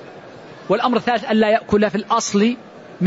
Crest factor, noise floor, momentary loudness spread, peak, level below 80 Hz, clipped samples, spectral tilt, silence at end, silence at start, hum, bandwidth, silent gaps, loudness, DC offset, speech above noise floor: 14 dB; -39 dBFS; 22 LU; -4 dBFS; -52 dBFS; under 0.1%; -5 dB/octave; 0 s; 0 s; none; 8 kHz; none; -18 LUFS; under 0.1%; 21 dB